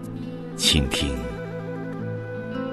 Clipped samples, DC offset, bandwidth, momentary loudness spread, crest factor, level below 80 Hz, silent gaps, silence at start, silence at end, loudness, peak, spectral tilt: under 0.1%; under 0.1%; 12.5 kHz; 14 LU; 22 dB; -36 dBFS; none; 0 s; 0 s; -25 LUFS; -4 dBFS; -4 dB/octave